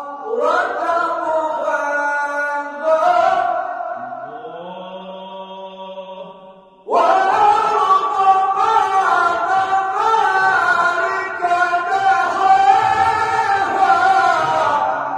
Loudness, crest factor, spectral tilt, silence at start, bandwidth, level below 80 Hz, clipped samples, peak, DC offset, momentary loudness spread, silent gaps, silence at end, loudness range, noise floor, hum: -16 LUFS; 16 dB; -3 dB/octave; 0 s; 10.5 kHz; -60 dBFS; under 0.1%; -2 dBFS; under 0.1%; 18 LU; none; 0 s; 7 LU; -42 dBFS; none